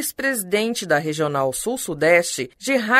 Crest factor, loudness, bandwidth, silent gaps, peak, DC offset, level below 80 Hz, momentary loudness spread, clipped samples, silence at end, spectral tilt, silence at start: 18 dB; -21 LUFS; 16 kHz; none; -2 dBFS; under 0.1%; -58 dBFS; 8 LU; under 0.1%; 0 s; -3.5 dB/octave; 0 s